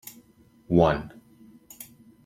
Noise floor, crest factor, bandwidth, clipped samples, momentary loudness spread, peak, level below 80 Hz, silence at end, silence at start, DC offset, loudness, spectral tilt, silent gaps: -58 dBFS; 22 dB; 16.5 kHz; under 0.1%; 24 LU; -6 dBFS; -50 dBFS; 0.4 s; 0.05 s; under 0.1%; -23 LUFS; -7 dB/octave; none